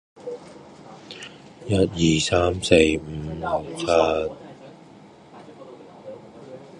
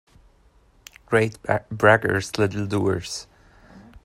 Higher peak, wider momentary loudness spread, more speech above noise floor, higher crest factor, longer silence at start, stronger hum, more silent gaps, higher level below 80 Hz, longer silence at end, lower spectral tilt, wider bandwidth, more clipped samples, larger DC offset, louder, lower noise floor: about the same, 0 dBFS vs -2 dBFS; first, 25 LU vs 10 LU; second, 27 dB vs 36 dB; about the same, 24 dB vs 22 dB; second, 0.2 s vs 1.1 s; neither; neither; first, -44 dBFS vs -52 dBFS; about the same, 0 s vs 0.05 s; about the same, -5 dB/octave vs -5.5 dB/octave; second, 11.5 kHz vs 16 kHz; neither; neither; about the same, -21 LUFS vs -22 LUFS; second, -47 dBFS vs -57 dBFS